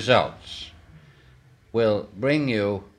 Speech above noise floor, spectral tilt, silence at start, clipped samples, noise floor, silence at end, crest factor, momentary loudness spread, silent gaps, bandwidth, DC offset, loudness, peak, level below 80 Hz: 30 dB; -6 dB/octave; 0 s; under 0.1%; -54 dBFS; 0.15 s; 22 dB; 16 LU; none; 11 kHz; under 0.1%; -24 LUFS; -4 dBFS; -56 dBFS